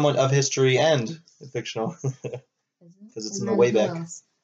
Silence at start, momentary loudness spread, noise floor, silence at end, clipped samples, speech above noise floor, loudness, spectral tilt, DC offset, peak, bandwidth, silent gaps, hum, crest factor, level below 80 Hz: 0 s; 18 LU; -56 dBFS; 0.25 s; under 0.1%; 33 dB; -23 LUFS; -5 dB/octave; under 0.1%; -6 dBFS; 8 kHz; none; none; 18 dB; -70 dBFS